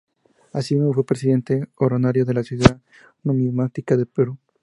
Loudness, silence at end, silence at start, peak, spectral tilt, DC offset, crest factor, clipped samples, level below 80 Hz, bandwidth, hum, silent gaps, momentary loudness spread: -21 LUFS; 0.25 s; 0.55 s; 0 dBFS; -7.5 dB/octave; under 0.1%; 20 dB; under 0.1%; -44 dBFS; 11.5 kHz; none; none; 8 LU